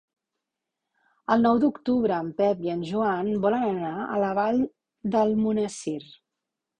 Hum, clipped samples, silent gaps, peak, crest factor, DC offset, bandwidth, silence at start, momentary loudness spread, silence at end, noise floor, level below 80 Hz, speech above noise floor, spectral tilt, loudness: none; under 0.1%; none; -6 dBFS; 20 dB; under 0.1%; 10 kHz; 1.3 s; 10 LU; 0.75 s; -85 dBFS; -62 dBFS; 61 dB; -6.5 dB/octave; -25 LUFS